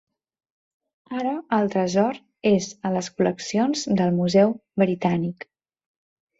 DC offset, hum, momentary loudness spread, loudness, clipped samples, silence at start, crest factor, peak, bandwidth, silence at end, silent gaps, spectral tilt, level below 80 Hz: under 0.1%; none; 8 LU; -23 LUFS; under 0.1%; 1.1 s; 18 dB; -6 dBFS; 7.8 kHz; 1.05 s; none; -6 dB/octave; -64 dBFS